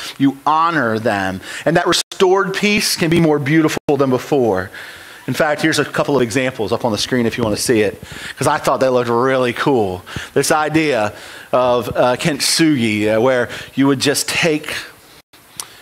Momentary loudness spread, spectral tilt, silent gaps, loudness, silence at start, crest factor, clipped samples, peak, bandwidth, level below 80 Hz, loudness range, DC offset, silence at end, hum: 9 LU; -4.5 dB/octave; 2.03-2.11 s, 3.80-3.88 s, 15.23-15.33 s; -16 LUFS; 0 s; 14 dB; under 0.1%; -2 dBFS; 16.5 kHz; -48 dBFS; 2 LU; under 0.1%; 0.15 s; none